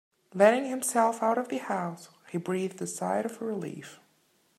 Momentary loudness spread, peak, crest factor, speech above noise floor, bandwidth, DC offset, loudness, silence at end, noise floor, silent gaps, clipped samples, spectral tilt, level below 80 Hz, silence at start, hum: 18 LU; -8 dBFS; 22 dB; 40 dB; 15.5 kHz; under 0.1%; -29 LUFS; 0.65 s; -68 dBFS; none; under 0.1%; -4.5 dB/octave; -82 dBFS; 0.35 s; none